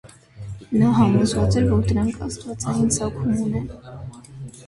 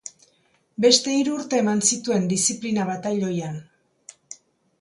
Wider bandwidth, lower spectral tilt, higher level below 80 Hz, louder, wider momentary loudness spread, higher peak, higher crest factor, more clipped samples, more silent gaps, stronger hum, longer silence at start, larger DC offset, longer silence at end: about the same, 11.5 kHz vs 11.5 kHz; first, -6.5 dB/octave vs -3.5 dB/octave; first, -38 dBFS vs -68 dBFS; about the same, -21 LUFS vs -21 LUFS; about the same, 21 LU vs 23 LU; about the same, -4 dBFS vs -2 dBFS; second, 16 dB vs 22 dB; neither; neither; neither; about the same, 0.05 s vs 0.05 s; neither; second, 0 s vs 0.45 s